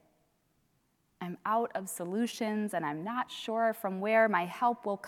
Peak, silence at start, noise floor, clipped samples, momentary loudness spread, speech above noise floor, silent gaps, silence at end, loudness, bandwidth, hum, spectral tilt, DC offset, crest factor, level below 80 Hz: -14 dBFS; 1.2 s; -74 dBFS; under 0.1%; 10 LU; 42 dB; none; 0 s; -32 LUFS; 17 kHz; none; -5 dB/octave; under 0.1%; 20 dB; -82 dBFS